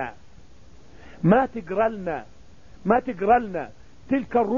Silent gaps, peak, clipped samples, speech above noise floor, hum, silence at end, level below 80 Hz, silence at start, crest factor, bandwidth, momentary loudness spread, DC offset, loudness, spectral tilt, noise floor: none; -6 dBFS; under 0.1%; 29 dB; none; 0 s; -50 dBFS; 0 s; 18 dB; 7.2 kHz; 14 LU; 0.6%; -24 LUFS; -9 dB/octave; -51 dBFS